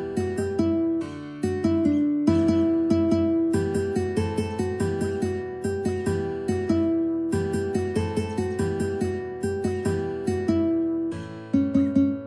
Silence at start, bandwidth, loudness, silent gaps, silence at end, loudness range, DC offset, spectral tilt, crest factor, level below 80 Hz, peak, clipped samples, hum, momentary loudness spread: 0 s; 11 kHz; -25 LUFS; none; 0 s; 4 LU; under 0.1%; -7.5 dB/octave; 16 dB; -50 dBFS; -8 dBFS; under 0.1%; none; 7 LU